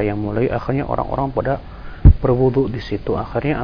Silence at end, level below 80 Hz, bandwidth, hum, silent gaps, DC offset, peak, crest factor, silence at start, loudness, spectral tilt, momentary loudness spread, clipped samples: 0 s; -22 dBFS; 5.4 kHz; none; none; under 0.1%; 0 dBFS; 16 dB; 0 s; -19 LUFS; -10.5 dB/octave; 9 LU; under 0.1%